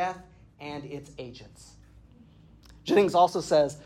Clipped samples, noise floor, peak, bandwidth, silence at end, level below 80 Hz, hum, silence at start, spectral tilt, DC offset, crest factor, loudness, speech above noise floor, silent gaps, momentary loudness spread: under 0.1%; -54 dBFS; -10 dBFS; 14.5 kHz; 0.05 s; -58 dBFS; none; 0 s; -5 dB/octave; under 0.1%; 18 dB; -25 LUFS; 28 dB; none; 21 LU